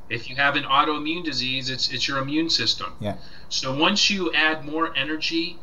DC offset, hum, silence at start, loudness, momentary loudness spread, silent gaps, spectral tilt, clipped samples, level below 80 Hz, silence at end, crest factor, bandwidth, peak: 2%; none; 0.1 s; -22 LUFS; 9 LU; none; -3 dB/octave; under 0.1%; -52 dBFS; 0 s; 20 dB; 12 kHz; -4 dBFS